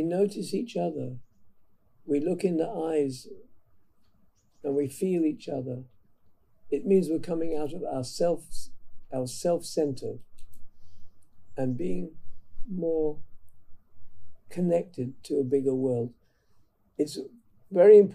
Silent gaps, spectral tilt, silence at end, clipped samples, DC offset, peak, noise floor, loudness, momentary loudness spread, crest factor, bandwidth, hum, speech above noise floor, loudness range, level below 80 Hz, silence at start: none; -7 dB/octave; 0 s; under 0.1%; under 0.1%; -8 dBFS; -63 dBFS; -28 LUFS; 16 LU; 20 dB; 14 kHz; none; 37 dB; 5 LU; -50 dBFS; 0 s